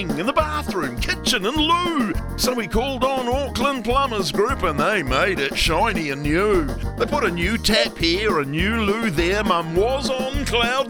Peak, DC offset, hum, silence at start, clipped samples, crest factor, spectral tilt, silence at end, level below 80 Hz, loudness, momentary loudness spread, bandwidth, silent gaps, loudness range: -4 dBFS; under 0.1%; none; 0 s; under 0.1%; 16 dB; -4.5 dB/octave; 0 s; -32 dBFS; -20 LUFS; 5 LU; 19.5 kHz; none; 1 LU